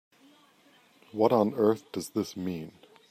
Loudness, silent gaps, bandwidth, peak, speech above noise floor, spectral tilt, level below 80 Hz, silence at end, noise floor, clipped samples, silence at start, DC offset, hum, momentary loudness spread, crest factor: -28 LUFS; none; 15.5 kHz; -8 dBFS; 34 dB; -6.5 dB/octave; -74 dBFS; 0.4 s; -62 dBFS; under 0.1%; 1.15 s; under 0.1%; none; 16 LU; 22 dB